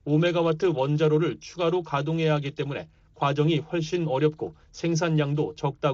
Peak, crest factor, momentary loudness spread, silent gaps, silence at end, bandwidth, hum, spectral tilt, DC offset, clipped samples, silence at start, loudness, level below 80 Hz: -10 dBFS; 14 dB; 9 LU; none; 0 s; 7.4 kHz; none; -6 dB/octave; under 0.1%; under 0.1%; 0.05 s; -25 LUFS; -58 dBFS